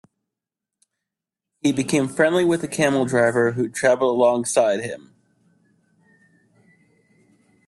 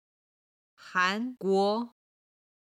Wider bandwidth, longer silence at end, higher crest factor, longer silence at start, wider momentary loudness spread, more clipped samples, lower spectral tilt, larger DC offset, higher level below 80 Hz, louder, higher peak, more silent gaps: about the same, 12.5 kHz vs 12.5 kHz; first, 2.7 s vs 0.75 s; about the same, 20 dB vs 20 dB; first, 1.65 s vs 0.8 s; about the same, 6 LU vs 7 LU; neither; about the same, -5 dB/octave vs -5 dB/octave; neither; first, -64 dBFS vs -86 dBFS; first, -20 LUFS vs -28 LUFS; first, -4 dBFS vs -12 dBFS; neither